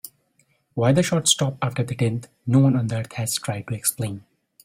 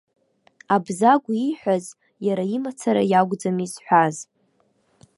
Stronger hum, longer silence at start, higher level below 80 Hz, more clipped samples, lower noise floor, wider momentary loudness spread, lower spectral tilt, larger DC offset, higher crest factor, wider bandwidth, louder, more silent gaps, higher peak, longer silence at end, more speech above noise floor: neither; second, 0.05 s vs 0.7 s; first, -56 dBFS vs -70 dBFS; neither; about the same, -65 dBFS vs -65 dBFS; about the same, 12 LU vs 10 LU; second, -4.5 dB/octave vs -6 dB/octave; neither; about the same, 20 dB vs 20 dB; first, 16 kHz vs 11.5 kHz; about the same, -22 LUFS vs -21 LUFS; neither; about the same, -4 dBFS vs -2 dBFS; second, 0.45 s vs 0.95 s; about the same, 43 dB vs 44 dB